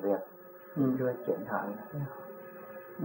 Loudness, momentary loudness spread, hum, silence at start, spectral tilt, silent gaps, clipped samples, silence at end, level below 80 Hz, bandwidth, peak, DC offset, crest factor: -34 LUFS; 16 LU; none; 0 s; -12.5 dB/octave; none; under 0.1%; 0 s; -78 dBFS; 16.5 kHz; -16 dBFS; under 0.1%; 18 dB